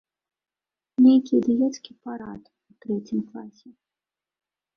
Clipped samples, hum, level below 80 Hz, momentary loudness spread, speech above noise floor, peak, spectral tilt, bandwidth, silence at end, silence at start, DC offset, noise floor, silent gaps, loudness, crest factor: under 0.1%; none; -68 dBFS; 23 LU; over 65 dB; -6 dBFS; -7 dB/octave; 6.6 kHz; 1.25 s; 1 s; under 0.1%; under -90 dBFS; none; -22 LUFS; 18 dB